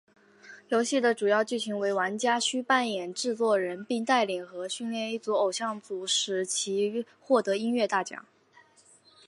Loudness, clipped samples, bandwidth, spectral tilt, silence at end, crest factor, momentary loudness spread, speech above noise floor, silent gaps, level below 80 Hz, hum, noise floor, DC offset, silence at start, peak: -28 LUFS; under 0.1%; 11.5 kHz; -2.5 dB/octave; 1.05 s; 18 dB; 8 LU; 32 dB; none; -84 dBFS; none; -60 dBFS; under 0.1%; 0.45 s; -10 dBFS